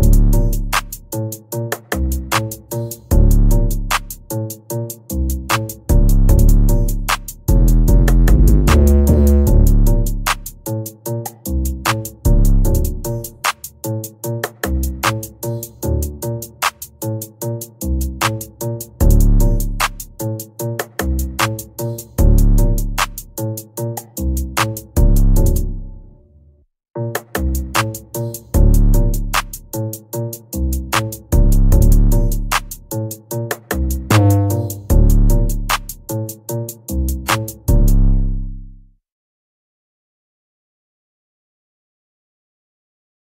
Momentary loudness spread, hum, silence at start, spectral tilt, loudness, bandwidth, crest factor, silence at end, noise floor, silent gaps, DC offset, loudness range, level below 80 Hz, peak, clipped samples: 12 LU; none; 0 s; -5.5 dB/octave; -18 LUFS; 16.5 kHz; 14 dB; 4.45 s; -50 dBFS; none; under 0.1%; 8 LU; -16 dBFS; 0 dBFS; under 0.1%